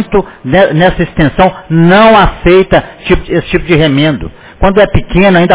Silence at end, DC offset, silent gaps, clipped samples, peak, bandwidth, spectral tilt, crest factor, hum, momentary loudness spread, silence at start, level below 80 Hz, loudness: 0 s; under 0.1%; none; 3%; 0 dBFS; 4 kHz; -10.5 dB/octave; 8 dB; none; 8 LU; 0 s; -22 dBFS; -8 LUFS